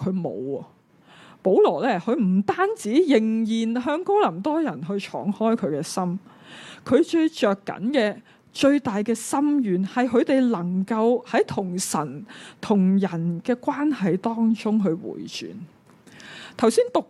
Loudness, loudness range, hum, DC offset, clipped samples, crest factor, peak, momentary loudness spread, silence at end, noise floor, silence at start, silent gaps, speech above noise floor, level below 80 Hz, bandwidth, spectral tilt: -23 LUFS; 3 LU; none; under 0.1%; under 0.1%; 18 dB; -4 dBFS; 14 LU; 0.05 s; -51 dBFS; 0 s; none; 29 dB; -68 dBFS; 13 kHz; -6 dB/octave